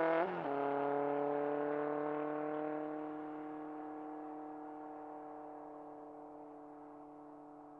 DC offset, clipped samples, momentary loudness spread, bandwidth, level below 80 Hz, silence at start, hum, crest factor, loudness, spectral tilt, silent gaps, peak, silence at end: under 0.1%; under 0.1%; 17 LU; 5.2 kHz; -82 dBFS; 0 s; none; 18 dB; -40 LUFS; -8.5 dB/octave; none; -22 dBFS; 0 s